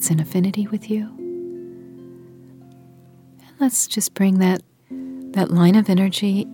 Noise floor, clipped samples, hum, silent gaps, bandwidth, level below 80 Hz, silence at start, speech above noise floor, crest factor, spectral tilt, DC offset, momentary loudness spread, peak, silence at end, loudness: -48 dBFS; under 0.1%; none; none; 19 kHz; -68 dBFS; 0 s; 30 dB; 18 dB; -5.5 dB/octave; under 0.1%; 21 LU; -4 dBFS; 0 s; -19 LUFS